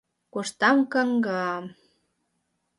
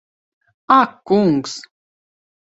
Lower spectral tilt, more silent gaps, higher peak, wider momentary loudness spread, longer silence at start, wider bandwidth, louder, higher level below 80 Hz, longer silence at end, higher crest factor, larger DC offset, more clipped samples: about the same, -4.5 dB/octave vs -5.5 dB/octave; neither; second, -8 dBFS vs 0 dBFS; about the same, 15 LU vs 15 LU; second, 0.35 s vs 0.7 s; first, 11.5 kHz vs 8.2 kHz; second, -24 LUFS vs -16 LUFS; second, -76 dBFS vs -62 dBFS; first, 1.1 s vs 0.95 s; about the same, 18 dB vs 20 dB; neither; neither